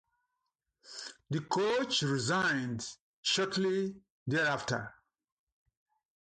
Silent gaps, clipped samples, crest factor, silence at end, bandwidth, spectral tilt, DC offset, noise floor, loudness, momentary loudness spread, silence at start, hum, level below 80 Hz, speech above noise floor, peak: 3.00-3.23 s, 4.10-4.26 s; under 0.1%; 18 dB; 1.3 s; 10 kHz; -4 dB/octave; under 0.1%; -85 dBFS; -32 LUFS; 15 LU; 0.85 s; none; -70 dBFS; 54 dB; -18 dBFS